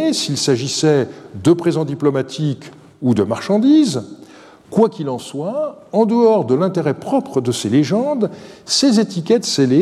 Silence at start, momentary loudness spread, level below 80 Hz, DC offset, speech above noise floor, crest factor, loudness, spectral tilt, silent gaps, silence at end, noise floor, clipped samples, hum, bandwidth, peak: 0 s; 10 LU; -62 dBFS; under 0.1%; 26 dB; 16 dB; -17 LUFS; -5.5 dB/octave; none; 0 s; -42 dBFS; under 0.1%; none; 13.5 kHz; -2 dBFS